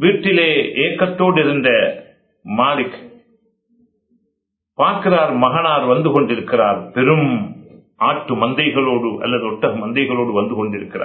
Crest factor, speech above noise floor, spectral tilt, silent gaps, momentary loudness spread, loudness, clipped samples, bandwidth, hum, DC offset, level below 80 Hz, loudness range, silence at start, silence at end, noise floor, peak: 18 dB; 58 dB; -10 dB/octave; none; 8 LU; -16 LUFS; under 0.1%; 4.5 kHz; none; under 0.1%; -58 dBFS; 4 LU; 0 s; 0 s; -74 dBFS; 0 dBFS